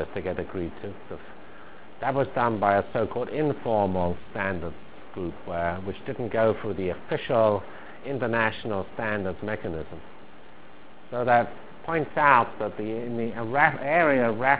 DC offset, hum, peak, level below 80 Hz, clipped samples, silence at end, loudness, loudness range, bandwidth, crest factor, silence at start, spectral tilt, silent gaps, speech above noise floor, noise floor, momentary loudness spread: 1%; none; -2 dBFS; -50 dBFS; under 0.1%; 0 s; -26 LUFS; 5 LU; 4 kHz; 24 dB; 0 s; -10 dB/octave; none; 24 dB; -50 dBFS; 18 LU